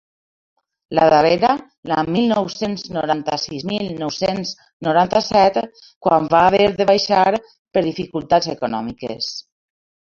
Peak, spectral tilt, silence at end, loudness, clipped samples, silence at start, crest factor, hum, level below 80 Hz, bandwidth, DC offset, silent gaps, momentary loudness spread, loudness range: 0 dBFS; -5 dB/octave; 0.7 s; -18 LUFS; under 0.1%; 0.9 s; 18 dB; none; -52 dBFS; 7.4 kHz; under 0.1%; 1.77-1.83 s, 4.73-4.80 s, 5.96-6.01 s, 7.59-7.65 s; 12 LU; 5 LU